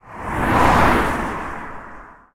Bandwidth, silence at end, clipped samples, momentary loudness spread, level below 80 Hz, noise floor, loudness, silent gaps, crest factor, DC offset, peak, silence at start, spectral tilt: 18.5 kHz; 0.2 s; under 0.1%; 21 LU; -30 dBFS; -40 dBFS; -18 LUFS; none; 18 dB; under 0.1%; -2 dBFS; 0.05 s; -5.5 dB/octave